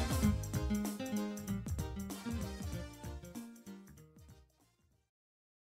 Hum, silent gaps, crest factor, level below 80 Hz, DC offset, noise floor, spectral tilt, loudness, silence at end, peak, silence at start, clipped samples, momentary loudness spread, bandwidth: none; none; 22 dB; -48 dBFS; under 0.1%; -73 dBFS; -5.5 dB/octave; -40 LUFS; 1.25 s; -20 dBFS; 0 s; under 0.1%; 20 LU; 16 kHz